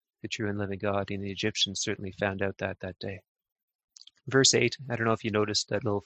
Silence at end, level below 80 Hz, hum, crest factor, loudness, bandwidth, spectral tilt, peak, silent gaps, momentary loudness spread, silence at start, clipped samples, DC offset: 0.05 s; -56 dBFS; none; 22 dB; -28 LUFS; 9.6 kHz; -3.5 dB/octave; -8 dBFS; 3.28-3.35 s, 3.52-3.56 s, 3.63-3.68 s, 3.75-3.88 s; 16 LU; 0.25 s; under 0.1%; under 0.1%